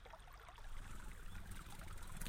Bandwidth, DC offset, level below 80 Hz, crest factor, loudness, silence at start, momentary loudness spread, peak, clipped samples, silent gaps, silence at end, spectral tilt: 16 kHz; under 0.1%; -52 dBFS; 22 dB; -56 LUFS; 0 s; 4 LU; -28 dBFS; under 0.1%; none; 0 s; -3.5 dB/octave